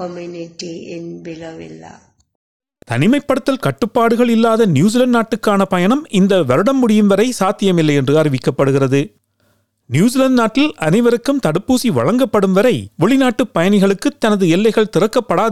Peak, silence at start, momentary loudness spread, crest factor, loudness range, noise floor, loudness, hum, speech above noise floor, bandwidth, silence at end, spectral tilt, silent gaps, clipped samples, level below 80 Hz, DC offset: -2 dBFS; 0 s; 15 LU; 12 dB; 5 LU; -60 dBFS; -14 LUFS; none; 47 dB; 14.5 kHz; 0 s; -6 dB/octave; 2.35-2.60 s; under 0.1%; -52 dBFS; 1%